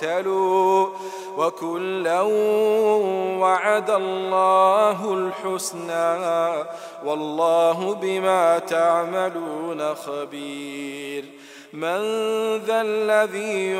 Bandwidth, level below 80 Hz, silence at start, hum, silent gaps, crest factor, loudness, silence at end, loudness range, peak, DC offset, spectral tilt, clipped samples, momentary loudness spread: 16 kHz; -82 dBFS; 0 s; none; none; 16 dB; -22 LUFS; 0 s; 7 LU; -4 dBFS; under 0.1%; -4 dB/octave; under 0.1%; 13 LU